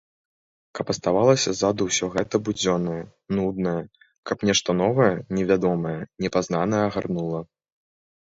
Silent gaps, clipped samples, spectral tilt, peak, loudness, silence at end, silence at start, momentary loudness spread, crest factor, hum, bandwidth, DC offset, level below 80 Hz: 4.18-4.23 s; under 0.1%; -4.5 dB/octave; -4 dBFS; -23 LUFS; 0.95 s; 0.75 s; 12 LU; 20 dB; none; 8 kHz; under 0.1%; -54 dBFS